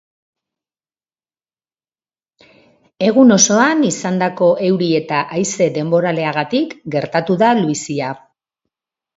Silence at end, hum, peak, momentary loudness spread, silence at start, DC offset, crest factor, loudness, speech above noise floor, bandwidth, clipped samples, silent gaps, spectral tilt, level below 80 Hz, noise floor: 1 s; none; 0 dBFS; 11 LU; 3 s; under 0.1%; 18 dB; -15 LUFS; over 75 dB; 8 kHz; under 0.1%; none; -4.5 dB/octave; -62 dBFS; under -90 dBFS